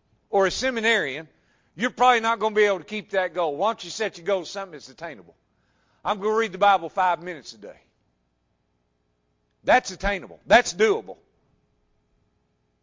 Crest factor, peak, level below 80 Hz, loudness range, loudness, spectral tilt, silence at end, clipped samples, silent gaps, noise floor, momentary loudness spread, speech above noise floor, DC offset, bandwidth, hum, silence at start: 22 dB; -4 dBFS; -50 dBFS; 6 LU; -23 LUFS; -3 dB/octave; 1.7 s; under 0.1%; none; -71 dBFS; 18 LU; 48 dB; under 0.1%; 7.6 kHz; 60 Hz at -65 dBFS; 0.3 s